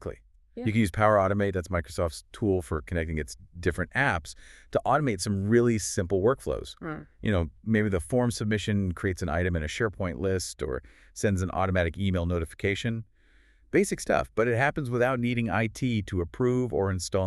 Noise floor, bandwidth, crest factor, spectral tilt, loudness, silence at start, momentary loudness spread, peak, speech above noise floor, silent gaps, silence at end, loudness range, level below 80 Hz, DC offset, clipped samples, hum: -60 dBFS; 13 kHz; 20 dB; -6 dB/octave; -28 LUFS; 0 s; 9 LU; -8 dBFS; 32 dB; none; 0 s; 3 LU; -44 dBFS; under 0.1%; under 0.1%; none